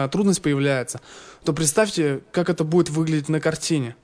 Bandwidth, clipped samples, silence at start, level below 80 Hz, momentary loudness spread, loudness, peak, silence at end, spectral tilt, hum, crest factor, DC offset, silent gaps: 11 kHz; under 0.1%; 0 s; -54 dBFS; 6 LU; -22 LUFS; -4 dBFS; 0.1 s; -5 dB/octave; none; 18 dB; under 0.1%; none